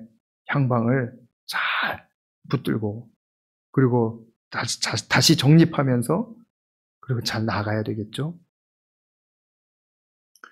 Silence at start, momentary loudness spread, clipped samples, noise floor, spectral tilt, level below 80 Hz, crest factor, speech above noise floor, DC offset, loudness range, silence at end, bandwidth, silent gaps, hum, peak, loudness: 0 s; 15 LU; under 0.1%; under -90 dBFS; -5 dB/octave; -62 dBFS; 20 dB; over 69 dB; under 0.1%; 9 LU; 2.15 s; 16 kHz; 0.20-0.45 s, 1.33-1.47 s, 2.14-2.42 s, 3.16-3.73 s, 4.36-4.51 s, 6.50-7.01 s; none; -6 dBFS; -23 LUFS